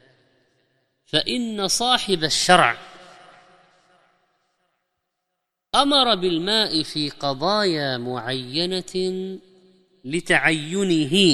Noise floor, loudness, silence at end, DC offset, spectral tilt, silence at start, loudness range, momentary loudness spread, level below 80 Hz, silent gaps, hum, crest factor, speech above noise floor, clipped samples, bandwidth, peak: -79 dBFS; -20 LUFS; 0 s; under 0.1%; -3.5 dB/octave; 1.15 s; 4 LU; 11 LU; -54 dBFS; none; none; 22 dB; 58 dB; under 0.1%; 14 kHz; 0 dBFS